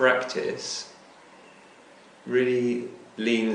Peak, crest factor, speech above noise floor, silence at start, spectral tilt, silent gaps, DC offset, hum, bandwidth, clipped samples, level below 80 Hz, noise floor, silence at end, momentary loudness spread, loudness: -8 dBFS; 20 dB; 27 dB; 0 s; -4 dB/octave; none; under 0.1%; none; 10 kHz; under 0.1%; -76 dBFS; -52 dBFS; 0 s; 16 LU; -27 LUFS